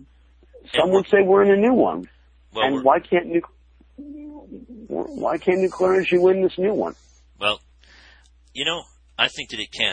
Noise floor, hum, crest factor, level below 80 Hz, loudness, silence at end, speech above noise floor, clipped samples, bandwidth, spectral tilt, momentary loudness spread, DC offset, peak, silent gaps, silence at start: -53 dBFS; none; 20 dB; -54 dBFS; -20 LUFS; 0 s; 34 dB; under 0.1%; 9.4 kHz; -5 dB/octave; 22 LU; under 0.1%; -2 dBFS; none; 0.7 s